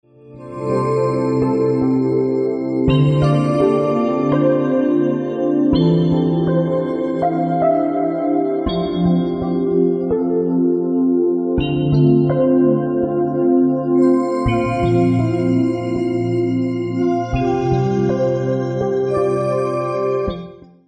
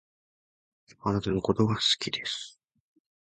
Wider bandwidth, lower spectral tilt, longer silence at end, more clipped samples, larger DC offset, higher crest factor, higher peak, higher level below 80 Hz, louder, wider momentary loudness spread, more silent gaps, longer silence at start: about the same, 8.8 kHz vs 9.4 kHz; first, -9 dB/octave vs -4.5 dB/octave; second, 0.3 s vs 0.75 s; neither; neither; second, 14 dB vs 20 dB; first, -2 dBFS vs -10 dBFS; first, -40 dBFS vs -54 dBFS; first, -17 LUFS vs -28 LUFS; second, 5 LU vs 11 LU; neither; second, 0.25 s vs 1.05 s